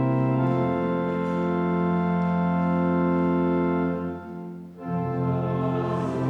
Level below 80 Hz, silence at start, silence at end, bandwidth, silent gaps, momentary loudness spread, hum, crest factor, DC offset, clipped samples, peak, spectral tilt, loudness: -54 dBFS; 0 s; 0 s; 4.7 kHz; none; 9 LU; none; 12 dB; under 0.1%; under 0.1%; -12 dBFS; -10 dB/octave; -25 LUFS